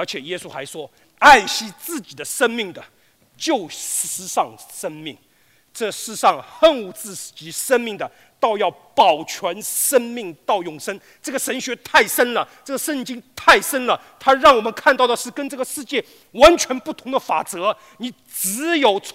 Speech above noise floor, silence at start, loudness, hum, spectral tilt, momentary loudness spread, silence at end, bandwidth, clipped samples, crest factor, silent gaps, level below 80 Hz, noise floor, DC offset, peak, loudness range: 38 dB; 0 s; -18 LUFS; none; -1.5 dB/octave; 17 LU; 0.05 s; 16 kHz; under 0.1%; 20 dB; none; -50 dBFS; -57 dBFS; under 0.1%; 0 dBFS; 7 LU